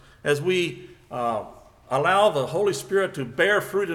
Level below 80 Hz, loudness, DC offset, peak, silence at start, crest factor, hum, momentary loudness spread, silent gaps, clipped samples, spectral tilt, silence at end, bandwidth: -60 dBFS; -23 LUFS; under 0.1%; -6 dBFS; 0.25 s; 18 dB; none; 11 LU; none; under 0.1%; -4.5 dB/octave; 0 s; 17 kHz